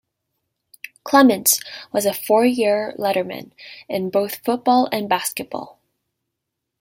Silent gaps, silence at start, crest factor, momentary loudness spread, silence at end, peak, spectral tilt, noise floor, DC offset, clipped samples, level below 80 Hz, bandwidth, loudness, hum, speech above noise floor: none; 1.05 s; 20 dB; 20 LU; 1.15 s; -2 dBFS; -3 dB/octave; -80 dBFS; under 0.1%; under 0.1%; -68 dBFS; 16.5 kHz; -19 LUFS; none; 61 dB